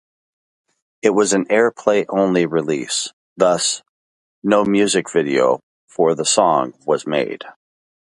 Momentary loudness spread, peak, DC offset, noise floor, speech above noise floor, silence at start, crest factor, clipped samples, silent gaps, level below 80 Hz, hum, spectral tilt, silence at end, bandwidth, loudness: 11 LU; 0 dBFS; under 0.1%; under -90 dBFS; over 73 dB; 1.05 s; 18 dB; under 0.1%; 3.13-3.36 s, 3.89-4.42 s, 5.63-5.88 s; -64 dBFS; none; -3.5 dB/octave; 0.65 s; 11.5 kHz; -18 LUFS